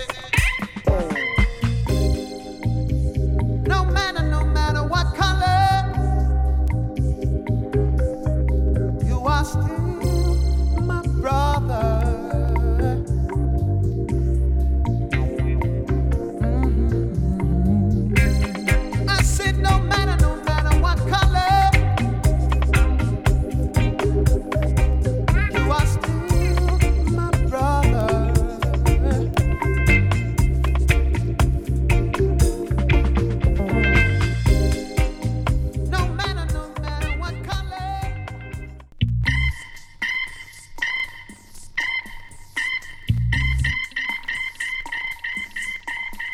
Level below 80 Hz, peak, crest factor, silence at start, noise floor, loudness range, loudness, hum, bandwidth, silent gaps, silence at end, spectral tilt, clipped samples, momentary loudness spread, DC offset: -22 dBFS; -2 dBFS; 16 dB; 0 s; -40 dBFS; 6 LU; -21 LUFS; none; 14 kHz; none; 0 s; -6 dB/octave; under 0.1%; 8 LU; under 0.1%